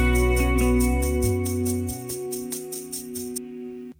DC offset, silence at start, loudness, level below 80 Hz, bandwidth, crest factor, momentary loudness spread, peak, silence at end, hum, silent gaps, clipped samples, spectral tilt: under 0.1%; 0 s; -25 LUFS; -28 dBFS; 19 kHz; 14 dB; 11 LU; -10 dBFS; 0.1 s; none; none; under 0.1%; -5.5 dB/octave